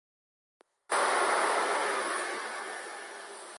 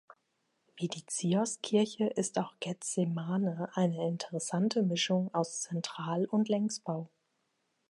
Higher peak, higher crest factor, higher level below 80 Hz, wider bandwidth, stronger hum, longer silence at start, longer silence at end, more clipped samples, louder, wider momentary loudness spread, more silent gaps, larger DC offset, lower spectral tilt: about the same, -16 dBFS vs -16 dBFS; about the same, 18 dB vs 18 dB; second, under -90 dBFS vs -82 dBFS; about the same, 12 kHz vs 11.5 kHz; neither; first, 0.9 s vs 0.75 s; second, 0 s vs 0.85 s; neither; first, -30 LUFS vs -33 LUFS; first, 15 LU vs 8 LU; neither; neither; second, 0 dB/octave vs -5 dB/octave